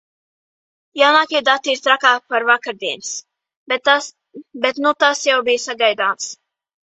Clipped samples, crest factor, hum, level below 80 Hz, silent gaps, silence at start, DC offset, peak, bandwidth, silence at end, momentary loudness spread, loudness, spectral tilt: under 0.1%; 18 dB; none; -70 dBFS; 3.57-3.66 s; 0.95 s; under 0.1%; 0 dBFS; 8.4 kHz; 0.5 s; 13 LU; -16 LUFS; 0 dB/octave